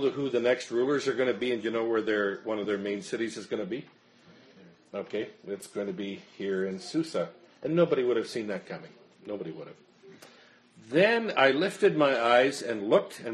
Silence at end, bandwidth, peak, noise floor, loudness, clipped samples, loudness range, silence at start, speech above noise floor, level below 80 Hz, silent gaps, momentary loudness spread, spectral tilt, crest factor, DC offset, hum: 0 s; 11.5 kHz; -8 dBFS; -57 dBFS; -28 LUFS; under 0.1%; 10 LU; 0 s; 29 dB; -76 dBFS; none; 15 LU; -5 dB/octave; 22 dB; under 0.1%; none